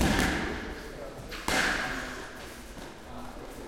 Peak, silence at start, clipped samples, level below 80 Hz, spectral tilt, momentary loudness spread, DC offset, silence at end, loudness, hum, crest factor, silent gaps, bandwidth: -8 dBFS; 0 s; under 0.1%; -42 dBFS; -3.5 dB/octave; 17 LU; under 0.1%; 0 s; -31 LUFS; none; 24 dB; none; 16.5 kHz